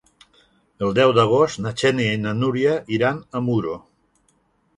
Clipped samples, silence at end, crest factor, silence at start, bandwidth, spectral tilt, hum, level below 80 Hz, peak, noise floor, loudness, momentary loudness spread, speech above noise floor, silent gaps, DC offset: under 0.1%; 1 s; 18 dB; 0.8 s; 11.5 kHz; -6 dB/octave; none; -56 dBFS; -2 dBFS; -64 dBFS; -20 LUFS; 9 LU; 44 dB; none; under 0.1%